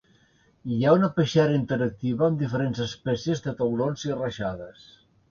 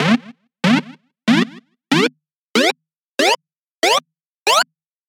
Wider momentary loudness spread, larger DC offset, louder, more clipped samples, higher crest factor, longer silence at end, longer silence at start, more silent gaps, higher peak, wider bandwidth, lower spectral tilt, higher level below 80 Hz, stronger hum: first, 11 LU vs 8 LU; neither; second, -25 LUFS vs -18 LUFS; neither; about the same, 18 dB vs 18 dB; first, 0.6 s vs 0.45 s; first, 0.65 s vs 0 s; second, none vs 2.35-2.54 s, 3.00-3.18 s, 3.59-3.82 s, 4.26-4.46 s; second, -8 dBFS vs 0 dBFS; second, 7.2 kHz vs 18.5 kHz; first, -7 dB/octave vs -3.5 dB/octave; first, -56 dBFS vs -68 dBFS; neither